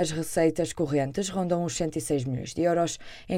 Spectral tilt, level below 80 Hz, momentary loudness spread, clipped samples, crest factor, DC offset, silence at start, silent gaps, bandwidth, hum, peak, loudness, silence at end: -5.5 dB/octave; -52 dBFS; 5 LU; under 0.1%; 16 dB; under 0.1%; 0 s; none; 16 kHz; none; -10 dBFS; -27 LUFS; 0 s